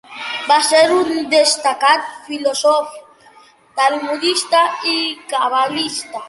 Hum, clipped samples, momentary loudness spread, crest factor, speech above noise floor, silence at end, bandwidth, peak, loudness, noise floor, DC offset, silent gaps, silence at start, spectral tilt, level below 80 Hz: none; under 0.1%; 10 LU; 16 dB; 31 dB; 0 s; 11.5 kHz; -2 dBFS; -15 LUFS; -47 dBFS; under 0.1%; none; 0.1 s; -1 dB/octave; -66 dBFS